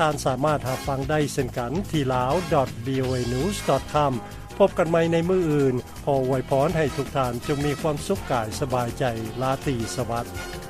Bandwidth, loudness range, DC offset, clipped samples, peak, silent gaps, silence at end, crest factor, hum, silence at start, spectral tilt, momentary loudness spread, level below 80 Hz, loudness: 15.5 kHz; 3 LU; under 0.1%; under 0.1%; -8 dBFS; none; 0 s; 16 dB; none; 0 s; -6 dB/octave; 6 LU; -42 dBFS; -24 LUFS